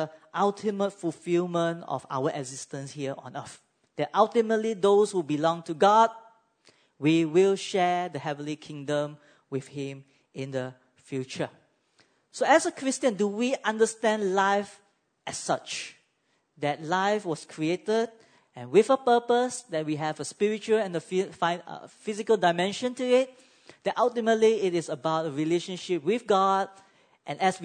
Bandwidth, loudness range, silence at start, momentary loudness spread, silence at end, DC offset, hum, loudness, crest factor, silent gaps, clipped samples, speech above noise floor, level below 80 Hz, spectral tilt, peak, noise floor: 9.6 kHz; 7 LU; 0 s; 14 LU; 0 s; under 0.1%; none; -27 LUFS; 22 dB; none; under 0.1%; 46 dB; -80 dBFS; -5 dB/octave; -6 dBFS; -73 dBFS